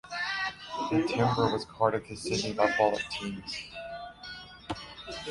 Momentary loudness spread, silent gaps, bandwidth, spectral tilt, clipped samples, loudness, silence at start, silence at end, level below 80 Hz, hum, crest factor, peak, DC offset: 15 LU; none; 11.5 kHz; -5 dB/octave; under 0.1%; -30 LUFS; 0.05 s; 0 s; -58 dBFS; none; 22 dB; -10 dBFS; under 0.1%